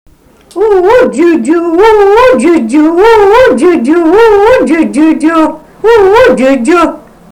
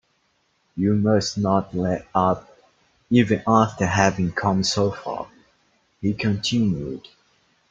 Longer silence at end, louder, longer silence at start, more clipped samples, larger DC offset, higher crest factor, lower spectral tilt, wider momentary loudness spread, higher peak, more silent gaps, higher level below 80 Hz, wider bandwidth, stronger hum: second, 0.35 s vs 0.7 s; first, -6 LUFS vs -22 LUFS; second, 0.55 s vs 0.75 s; first, 2% vs under 0.1%; neither; second, 6 dB vs 22 dB; about the same, -5 dB/octave vs -5.5 dB/octave; second, 5 LU vs 12 LU; about the same, 0 dBFS vs -2 dBFS; neither; first, -34 dBFS vs -54 dBFS; first, 14.5 kHz vs 8.2 kHz; neither